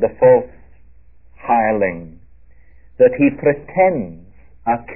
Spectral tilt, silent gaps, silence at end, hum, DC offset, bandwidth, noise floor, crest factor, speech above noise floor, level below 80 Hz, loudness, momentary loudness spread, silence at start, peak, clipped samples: -12.5 dB/octave; none; 0 s; none; 0.7%; 3 kHz; -48 dBFS; 16 dB; 33 dB; -48 dBFS; -16 LUFS; 19 LU; 0 s; -2 dBFS; under 0.1%